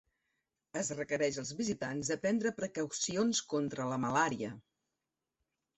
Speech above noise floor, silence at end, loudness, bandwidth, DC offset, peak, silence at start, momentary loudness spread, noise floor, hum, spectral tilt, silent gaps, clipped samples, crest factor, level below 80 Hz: 54 dB; 1.15 s; -35 LUFS; 8.2 kHz; under 0.1%; -16 dBFS; 0.75 s; 7 LU; -89 dBFS; none; -4 dB/octave; none; under 0.1%; 20 dB; -72 dBFS